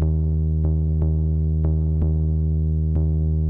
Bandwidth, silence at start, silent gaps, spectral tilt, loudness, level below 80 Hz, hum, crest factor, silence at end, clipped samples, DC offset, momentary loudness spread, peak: 1.3 kHz; 0 s; none; -13.5 dB/octave; -22 LUFS; -26 dBFS; none; 6 dB; 0 s; under 0.1%; under 0.1%; 1 LU; -14 dBFS